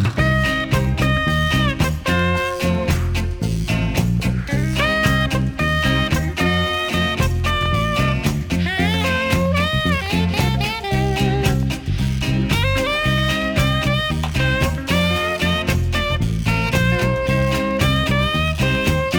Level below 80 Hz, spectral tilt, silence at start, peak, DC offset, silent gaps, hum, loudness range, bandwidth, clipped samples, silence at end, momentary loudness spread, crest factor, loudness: -28 dBFS; -5.5 dB/octave; 0 s; -2 dBFS; under 0.1%; none; none; 1 LU; over 20 kHz; under 0.1%; 0 s; 3 LU; 16 dB; -19 LUFS